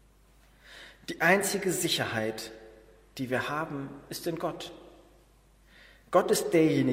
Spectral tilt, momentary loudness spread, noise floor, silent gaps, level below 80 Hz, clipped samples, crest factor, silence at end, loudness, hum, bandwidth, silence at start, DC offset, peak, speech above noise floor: -4 dB/octave; 20 LU; -60 dBFS; none; -62 dBFS; under 0.1%; 20 dB; 0 s; -28 LUFS; none; 16 kHz; 0.7 s; under 0.1%; -10 dBFS; 32 dB